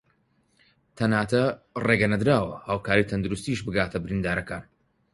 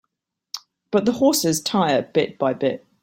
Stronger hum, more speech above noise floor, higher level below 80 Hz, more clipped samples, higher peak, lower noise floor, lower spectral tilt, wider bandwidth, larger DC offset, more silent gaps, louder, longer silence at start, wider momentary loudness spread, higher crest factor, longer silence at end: neither; second, 43 dB vs 58 dB; first, -48 dBFS vs -60 dBFS; neither; about the same, -4 dBFS vs -4 dBFS; second, -67 dBFS vs -78 dBFS; first, -6.5 dB/octave vs -4 dB/octave; second, 11.5 kHz vs 16.5 kHz; neither; neither; second, -25 LUFS vs -20 LUFS; first, 0.95 s vs 0.55 s; second, 8 LU vs 17 LU; first, 22 dB vs 16 dB; first, 0.5 s vs 0.25 s